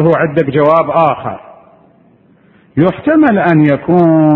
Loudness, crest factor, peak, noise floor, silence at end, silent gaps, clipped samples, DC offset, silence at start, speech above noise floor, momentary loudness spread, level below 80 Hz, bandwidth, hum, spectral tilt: -11 LUFS; 12 dB; 0 dBFS; -47 dBFS; 0 s; none; 0.2%; under 0.1%; 0 s; 38 dB; 11 LU; -48 dBFS; 4.2 kHz; none; -10.5 dB/octave